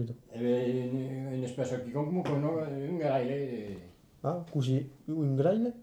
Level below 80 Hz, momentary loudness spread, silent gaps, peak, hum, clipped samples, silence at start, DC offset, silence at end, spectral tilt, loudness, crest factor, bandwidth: -68 dBFS; 9 LU; none; -16 dBFS; none; under 0.1%; 0 s; under 0.1%; 0 s; -8 dB/octave; -32 LUFS; 16 dB; 9.8 kHz